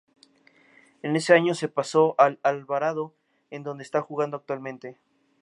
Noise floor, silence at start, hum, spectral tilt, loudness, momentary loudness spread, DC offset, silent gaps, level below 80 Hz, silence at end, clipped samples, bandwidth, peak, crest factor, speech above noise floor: -60 dBFS; 1.05 s; none; -5.5 dB/octave; -24 LUFS; 18 LU; under 0.1%; none; -82 dBFS; 0.5 s; under 0.1%; 11.5 kHz; -2 dBFS; 22 dB; 35 dB